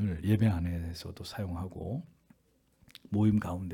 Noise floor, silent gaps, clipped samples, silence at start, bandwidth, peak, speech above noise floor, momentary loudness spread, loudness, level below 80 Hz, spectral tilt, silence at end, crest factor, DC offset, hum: -70 dBFS; none; under 0.1%; 0 s; 15 kHz; -14 dBFS; 39 dB; 13 LU; -32 LUFS; -54 dBFS; -8 dB/octave; 0 s; 18 dB; under 0.1%; none